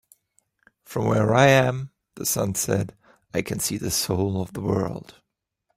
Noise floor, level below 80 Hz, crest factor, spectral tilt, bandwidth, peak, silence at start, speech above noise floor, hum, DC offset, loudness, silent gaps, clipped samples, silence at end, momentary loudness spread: -76 dBFS; -54 dBFS; 22 dB; -4.5 dB/octave; 16 kHz; -4 dBFS; 0.9 s; 54 dB; none; under 0.1%; -23 LUFS; none; under 0.1%; 0.65 s; 15 LU